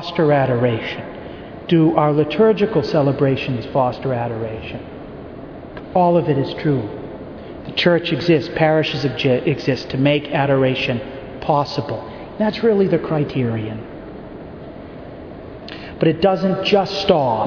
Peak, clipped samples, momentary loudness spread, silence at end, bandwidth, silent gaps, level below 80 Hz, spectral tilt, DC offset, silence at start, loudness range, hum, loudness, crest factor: 0 dBFS; under 0.1%; 19 LU; 0 s; 5.4 kHz; none; -46 dBFS; -7.5 dB/octave; under 0.1%; 0 s; 4 LU; none; -18 LUFS; 18 dB